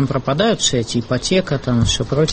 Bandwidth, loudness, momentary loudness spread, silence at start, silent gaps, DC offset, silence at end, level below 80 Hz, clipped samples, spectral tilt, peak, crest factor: 8.8 kHz; -17 LUFS; 5 LU; 0 s; none; under 0.1%; 0 s; -34 dBFS; under 0.1%; -4.5 dB/octave; -4 dBFS; 14 dB